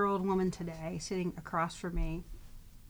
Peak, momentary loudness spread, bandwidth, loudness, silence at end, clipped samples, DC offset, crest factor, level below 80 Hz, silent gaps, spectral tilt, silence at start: -20 dBFS; 12 LU; over 20 kHz; -36 LUFS; 0 s; under 0.1%; under 0.1%; 16 dB; -44 dBFS; none; -6 dB/octave; 0 s